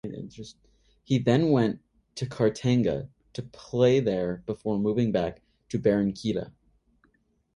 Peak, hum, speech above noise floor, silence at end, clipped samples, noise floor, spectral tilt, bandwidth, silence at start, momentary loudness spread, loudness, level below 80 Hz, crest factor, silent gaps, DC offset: -8 dBFS; none; 42 dB; 1.05 s; under 0.1%; -68 dBFS; -7.5 dB/octave; 11 kHz; 0.05 s; 18 LU; -26 LUFS; -56 dBFS; 20 dB; none; under 0.1%